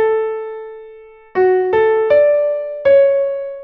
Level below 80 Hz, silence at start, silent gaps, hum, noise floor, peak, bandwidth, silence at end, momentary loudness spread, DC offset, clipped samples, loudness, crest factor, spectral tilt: -56 dBFS; 0 s; none; none; -39 dBFS; -2 dBFS; 4.5 kHz; 0 s; 14 LU; under 0.1%; under 0.1%; -14 LUFS; 12 dB; -8 dB/octave